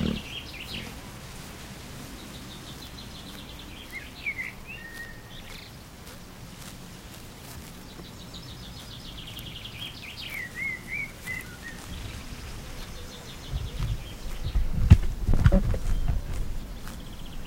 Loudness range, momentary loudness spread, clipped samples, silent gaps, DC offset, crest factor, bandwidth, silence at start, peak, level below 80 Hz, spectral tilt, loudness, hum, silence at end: 15 LU; 14 LU; under 0.1%; none; under 0.1%; 28 dB; 16 kHz; 0 s; -2 dBFS; -32 dBFS; -5.5 dB/octave; -33 LUFS; none; 0 s